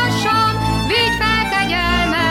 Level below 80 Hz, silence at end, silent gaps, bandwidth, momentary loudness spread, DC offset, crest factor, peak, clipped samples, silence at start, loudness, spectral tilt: -30 dBFS; 0 s; none; 16.5 kHz; 2 LU; under 0.1%; 12 dB; -4 dBFS; under 0.1%; 0 s; -16 LUFS; -4.5 dB/octave